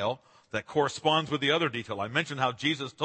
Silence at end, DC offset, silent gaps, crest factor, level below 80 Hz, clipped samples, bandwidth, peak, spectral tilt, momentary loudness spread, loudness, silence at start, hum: 0 s; under 0.1%; none; 20 dB; -70 dBFS; under 0.1%; 8.8 kHz; -10 dBFS; -4.5 dB/octave; 9 LU; -29 LUFS; 0 s; none